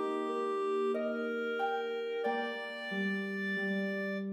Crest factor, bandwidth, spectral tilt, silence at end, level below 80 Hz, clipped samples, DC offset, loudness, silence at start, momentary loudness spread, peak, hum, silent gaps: 12 dB; 14.5 kHz; -6.5 dB/octave; 0 s; under -90 dBFS; under 0.1%; under 0.1%; -35 LUFS; 0 s; 3 LU; -22 dBFS; none; none